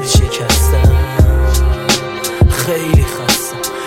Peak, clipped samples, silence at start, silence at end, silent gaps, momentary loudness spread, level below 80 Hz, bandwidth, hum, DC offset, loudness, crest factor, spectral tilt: 0 dBFS; under 0.1%; 0 s; 0 s; none; 3 LU; -16 dBFS; 17 kHz; none; under 0.1%; -13 LUFS; 12 dB; -4.5 dB/octave